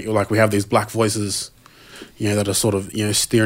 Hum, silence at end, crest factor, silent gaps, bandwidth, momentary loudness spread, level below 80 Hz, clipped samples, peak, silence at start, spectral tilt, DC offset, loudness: none; 0 s; 18 dB; none; 16.5 kHz; 10 LU; -50 dBFS; under 0.1%; -2 dBFS; 0 s; -4 dB/octave; under 0.1%; -20 LUFS